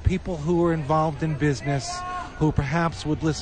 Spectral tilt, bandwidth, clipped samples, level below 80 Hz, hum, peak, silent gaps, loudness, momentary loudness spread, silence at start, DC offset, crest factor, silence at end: -6.5 dB/octave; 9.8 kHz; under 0.1%; -38 dBFS; none; -6 dBFS; none; -25 LUFS; 5 LU; 0 s; under 0.1%; 18 dB; 0 s